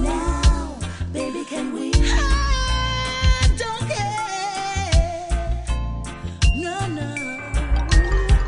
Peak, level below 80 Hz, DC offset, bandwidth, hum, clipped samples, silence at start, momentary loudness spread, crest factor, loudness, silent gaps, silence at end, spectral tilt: -4 dBFS; -22 dBFS; under 0.1%; 10.5 kHz; none; under 0.1%; 0 s; 8 LU; 16 dB; -23 LUFS; none; 0 s; -4.5 dB/octave